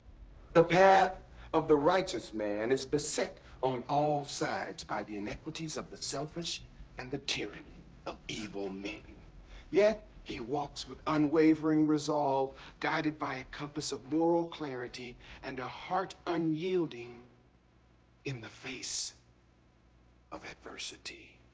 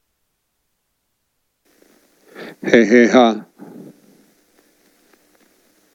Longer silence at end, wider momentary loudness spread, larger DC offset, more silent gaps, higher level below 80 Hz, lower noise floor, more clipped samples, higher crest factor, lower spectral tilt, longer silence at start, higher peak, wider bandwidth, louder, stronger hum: second, 0.25 s vs 2.5 s; second, 18 LU vs 28 LU; neither; neither; about the same, -58 dBFS vs -60 dBFS; second, -65 dBFS vs -71 dBFS; neither; about the same, 22 dB vs 20 dB; about the same, -4.5 dB/octave vs -5 dB/octave; second, 0.05 s vs 2.4 s; second, -10 dBFS vs 0 dBFS; about the same, 8 kHz vs 7.6 kHz; second, -33 LUFS vs -13 LUFS; neither